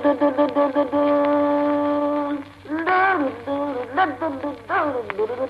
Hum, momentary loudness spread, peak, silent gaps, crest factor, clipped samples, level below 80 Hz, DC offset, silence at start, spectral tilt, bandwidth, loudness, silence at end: none; 8 LU; -6 dBFS; none; 16 dB; under 0.1%; -58 dBFS; under 0.1%; 0 s; -7 dB/octave; 5.4 kHz; -21 LUFS; 0 s